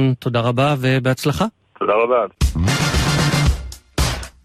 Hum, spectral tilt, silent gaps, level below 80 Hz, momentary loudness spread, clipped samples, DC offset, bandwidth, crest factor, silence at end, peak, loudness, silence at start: none; -5.5 dB/octave; none; -26 dBFS; 6 LU; under 0.1%; under 0.1%; 14.5 kHz; 14 dB; 0.15 s; -4 dBFS; -18 LUFS; 0 s